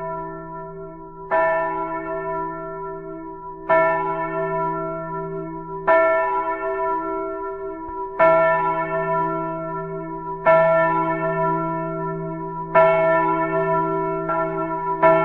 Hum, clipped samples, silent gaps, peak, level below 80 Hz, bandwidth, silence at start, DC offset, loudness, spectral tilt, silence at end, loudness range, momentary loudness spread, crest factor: none; under 0.1%; none; -2 dBFS; -48 dBFS; 4.3 kHz; 0 s; under 0.1%; -21 LUFS; -9 dB/octave; 0 s; 5 LU; 15 LU; 20 dB